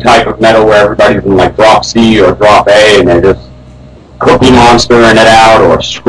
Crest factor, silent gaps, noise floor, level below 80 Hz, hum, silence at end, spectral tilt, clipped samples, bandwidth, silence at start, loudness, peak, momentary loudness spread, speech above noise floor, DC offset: 4 dB; none; -31 dBFS; -26 dBFS; none; 0.05 s; -4.5 dB/octave; 10%; 11 kHz; 0 s; -4 LUFS; 0 dBFS; 5 LU; 27 dB; under 0.1%